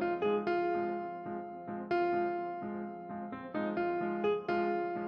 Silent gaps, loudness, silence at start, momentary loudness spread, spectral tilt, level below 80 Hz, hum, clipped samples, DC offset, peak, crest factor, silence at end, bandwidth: none; -35 LUFS; 0 s; 10 LU; -8.5 dB/octave; -72 dBFS; none; under 0.1%; under 0.1%; -22 dBFS; 14 dB; 0 s; 5.4 kHz